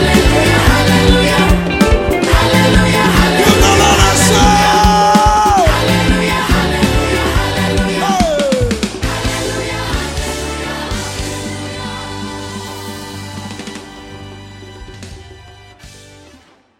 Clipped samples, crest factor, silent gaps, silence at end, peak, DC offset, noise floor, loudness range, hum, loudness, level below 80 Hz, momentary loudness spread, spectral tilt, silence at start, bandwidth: under 0.1%; 12 dB; none; 0.8 s; 0 dBFS; under 0.1%; -45 dBFS; 18 LU; none; -12 LUFS; -22 dBFS; 19 LU; -4.5 dB/octave; 0 s; 17 kHz